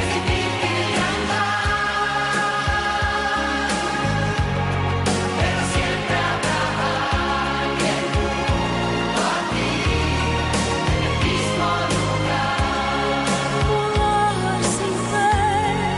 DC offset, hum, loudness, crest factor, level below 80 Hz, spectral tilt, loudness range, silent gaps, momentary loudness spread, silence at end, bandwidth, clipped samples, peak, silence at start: under 0.1%; none; -21 LUFS; 12 dB; -32 dBFS; -4.5 dB/octave; 1 LU; none; 2 LU; 0 s; 11.5 kHz; under 0.1%; -8 dBFS; 0 s